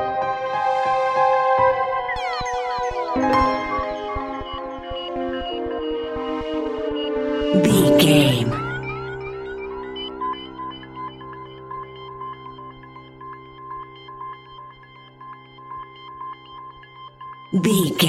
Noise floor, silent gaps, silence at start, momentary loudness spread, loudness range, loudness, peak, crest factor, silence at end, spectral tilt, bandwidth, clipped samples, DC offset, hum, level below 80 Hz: -45 dBFS; none; 0 s; 22 LU; 19 LU; -21 LUFS; -2 dBFS; 20 dB; 0 s; -5 dB/octave; 16 kHz; under 0.1%; under 0.1%; none; -44 dBFS